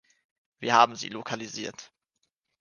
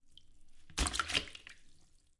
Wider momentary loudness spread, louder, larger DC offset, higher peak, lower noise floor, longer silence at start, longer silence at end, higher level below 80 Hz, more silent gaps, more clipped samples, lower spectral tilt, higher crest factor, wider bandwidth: second, 16 LU vs 19 LU; first, -26 LUFS vs -36 LUFS; neither; first, -4 dBFS vs -16 dBFS; first, -79 dBFS vs -62 dBFS; first, 0.6 s vs 0.05 s; first, 0.75 s vs 0.35 s; second, -76 dBFS vs -48 dBFS; neither; neither; first, -3 dB/octave vs -1.5 dB/octave; about the same, 26 dB vs 24 dB; second, 10 kHz vs 11.5 kHz